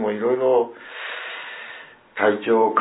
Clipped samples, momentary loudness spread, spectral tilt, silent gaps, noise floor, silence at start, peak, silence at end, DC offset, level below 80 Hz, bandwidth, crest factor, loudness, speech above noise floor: under 0.1%; 17 LU; -9 dB/octave; none; -42 dBFS; 0 s; -4 dBFS; 0 s; under 0.1%; -78 dBFS; 4 kHz; 18 dB; -22 LUFS; 22 dB